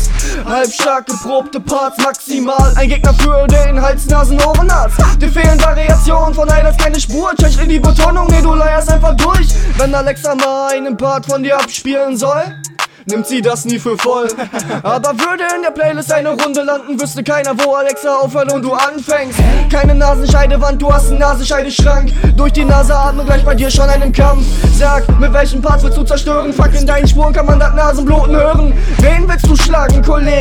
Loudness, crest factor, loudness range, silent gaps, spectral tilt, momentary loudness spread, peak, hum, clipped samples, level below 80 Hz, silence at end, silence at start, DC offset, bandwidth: -12 LUFS; 10 dB; 4 LU; none; -5 dB/octave; 6 LU; 0 dBFS; none; 0.2%; -12 dBFS; 0 s; 0 s; under 0.1%; 15 kHz